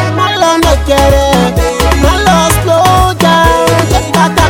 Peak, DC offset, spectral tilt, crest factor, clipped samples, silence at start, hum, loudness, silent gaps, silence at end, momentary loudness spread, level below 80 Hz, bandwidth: 0 dBFS; under 0.1%; -4.5 dB/octave; 8 dB; under 0.1%; 0 s; none; -8 LUFS; none; 0 s; 3 LU; -16 dBFS; 18 kHz